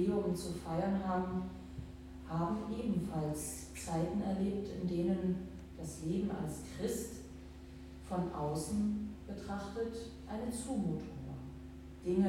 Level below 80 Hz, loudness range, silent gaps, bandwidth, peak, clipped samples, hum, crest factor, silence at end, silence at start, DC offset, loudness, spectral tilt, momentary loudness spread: -54 dBFS; 3 LU; none; 16.5 kHz; -22 dBFS; under 0.1%; none; 16 dB; 0 s; 0 s; under 0.1%; -39 LUFS; -6.5 dB/octave; 13 LU